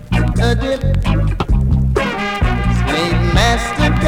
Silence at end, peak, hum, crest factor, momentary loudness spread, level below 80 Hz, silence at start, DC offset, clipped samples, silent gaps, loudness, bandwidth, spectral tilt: 0 s; 0 dBFS; none; 14 dB; 4 LU; -18 dBFS; 0 s; under 0.1%; under 0.1%; none; -16 LUFS; 13.5 kHz; -6 dB/octave